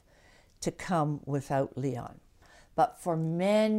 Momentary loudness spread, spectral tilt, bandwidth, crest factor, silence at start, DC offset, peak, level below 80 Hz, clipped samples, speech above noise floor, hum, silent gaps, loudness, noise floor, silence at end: 10 LU; -6.5 dB/octave; 15.5 kHz; 18 dB; 0.6 s; under 0.1%; -14 dBFS; -60 dBFS; under 0.1%; 31 dB; none; none; -31 LUFS; -60 dBFS; 0 s